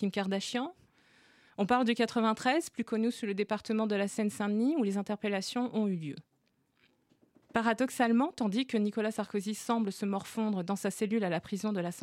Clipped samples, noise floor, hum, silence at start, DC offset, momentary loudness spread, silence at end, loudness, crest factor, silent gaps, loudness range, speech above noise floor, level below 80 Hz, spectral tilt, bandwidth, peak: under 0.1%; -75 dBFS; none; 0 s; under 0.1%; 7 LU; 0 s; -32 LUFS; 18 dB; none; 3 LU; 43 dB; -74 dBFS; -5 dB/octave; 15.5 kHz; -14 dBFS